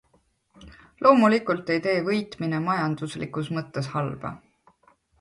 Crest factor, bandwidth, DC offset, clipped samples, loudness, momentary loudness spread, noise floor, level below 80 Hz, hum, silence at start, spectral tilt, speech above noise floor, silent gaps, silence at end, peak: 22 dB; 11.5 kHz; under 0.1%; under 0.1%; -24 LUFS; 13 LU; -66 dBFS; -60 dBFS; none; 0.6 s; -7 dB/octave; 42 dB; none; 0.85 s; -2 dBFS